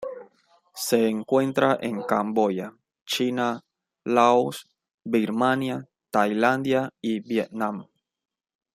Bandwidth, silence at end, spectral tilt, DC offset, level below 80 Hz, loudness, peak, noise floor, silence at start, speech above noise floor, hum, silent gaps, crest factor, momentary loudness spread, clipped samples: 16 kHz; 0.9 s; -5 dB/octave; under 0.1%; -70 dBFS; -24 LUFS; -4 dBFS; -61 dBFS; 0 s; 38 dB; none; 3.02-3.06 s, 4.94-4.98 s; 20 dB; 16 LU; under 0.1%